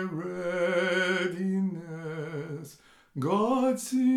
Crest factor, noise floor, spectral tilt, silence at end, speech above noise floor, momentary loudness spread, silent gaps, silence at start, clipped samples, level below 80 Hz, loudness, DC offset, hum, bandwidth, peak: 14 dB; -53 dBFS; -5.5 dB/octave; 0 s; 26 dB; 13 LU; none; 0 s; under 0.1%; -72 dBFS; -29 LUFS; under 0.1%; none; 15 kHz; -14 dBFS